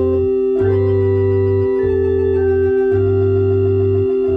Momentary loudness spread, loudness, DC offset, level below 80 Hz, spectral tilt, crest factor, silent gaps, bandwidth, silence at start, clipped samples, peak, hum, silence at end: 1 LU; -15 LUFS; under 0.1%; -36 dBFS; -11 dB/octave; 8 dB; none; 3.7 kHz; 0 s; under 0.1%; -6 dBFS; none; 0 s